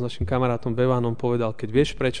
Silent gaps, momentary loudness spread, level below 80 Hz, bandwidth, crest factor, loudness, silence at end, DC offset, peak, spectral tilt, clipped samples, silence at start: none; 3 LU; -42 dBFS; 10 kHz; 16 dB; -24 LUFS; 0 s; 2%; -8 dBFS; -7 dB/octave; under 0.1%; 0 s